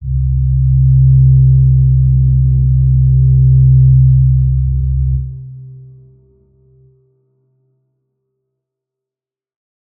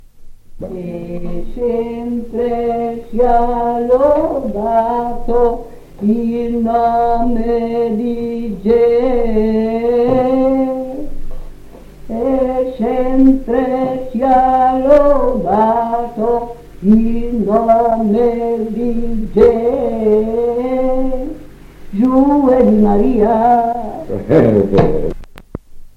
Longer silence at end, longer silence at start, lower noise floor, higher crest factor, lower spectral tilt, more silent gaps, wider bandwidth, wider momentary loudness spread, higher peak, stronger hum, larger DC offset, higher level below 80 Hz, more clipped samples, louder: first, 4.2 s vs 0.1 s; second, 0 s vs 0.2 s; first, -89 dBFS vs -34 dBFS; about the same, 10 dB vs 14 dB; first, -20.5 dB/octave vs -9 dB/octave; neither; second, 0.4 kHz vs 6.6 kHz; second, 8 LU vs 14 LU; about the same, -2 dBFS vs 0 dBFS; neither; neither; first, -18 dBFS vs -28 dBFS; neither; first, -10 LUFS vs -14 LUFS